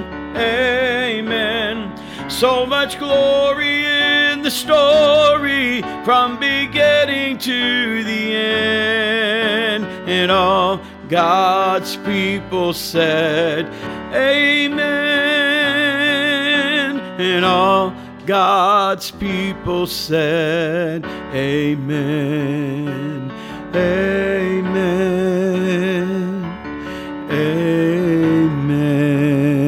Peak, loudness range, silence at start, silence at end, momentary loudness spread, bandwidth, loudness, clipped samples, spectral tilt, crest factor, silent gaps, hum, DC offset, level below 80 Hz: -2 dBFS; 5 LU; 0 s; 0 s; 10 LU; 17 kHz; -16 LUFS; under 0.1%; -5 dB/octave; 16 dB; none; none; under 0.1%; -46 dBFS